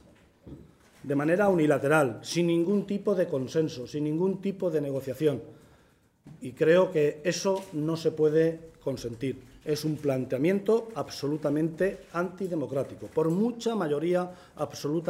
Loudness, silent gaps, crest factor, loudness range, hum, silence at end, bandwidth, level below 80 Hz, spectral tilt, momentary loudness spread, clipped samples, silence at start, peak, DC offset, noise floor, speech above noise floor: -28 LUFS; none; 20 dB; 4 LU; none; 0 s; 16 kHz; -64 dBFS; -6.5 dB/octave; 11 LU; under 0.1%; 0.45 s; -8 dBFS; under 0.1%; -63 dBFS; 36 dB